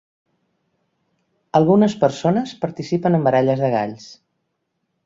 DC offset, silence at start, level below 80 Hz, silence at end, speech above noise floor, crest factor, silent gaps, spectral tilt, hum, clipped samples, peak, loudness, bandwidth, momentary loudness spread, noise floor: under 0.1%; 1.55 s; -60 dBFS; 0.9 s; 56 dB; 18 dB; none; -7.5 dB/octave; none; under 0.1%; -2 dBFS; -18 LUFS; 7.8 kHz; 11 LU; -74 dBFS